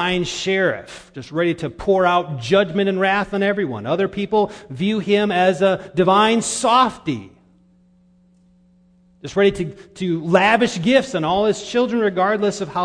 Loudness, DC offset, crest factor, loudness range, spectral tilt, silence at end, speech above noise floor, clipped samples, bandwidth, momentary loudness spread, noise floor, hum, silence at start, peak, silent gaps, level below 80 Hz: -18 LUFS; under 0.1%; 20 dB; 5 LU; -5 dB/octave; 0 s; 36 dB; under 0.1%; 10.5 kHz; 11 LU; -55 dBFS; none; 0 s; 0 dBFS; none; -50 dBFS